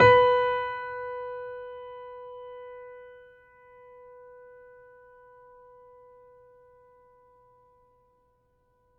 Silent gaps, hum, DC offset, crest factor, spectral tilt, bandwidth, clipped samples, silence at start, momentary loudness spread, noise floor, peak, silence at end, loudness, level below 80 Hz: none; none; under 0.1%; 24 dB; -6 dB/octave; 7 kHz; under 0.1%; 0 s; 28 LU; -69 dBFS; -6 dBFS; 5.9 s; -27 LUFS; -60 dBFS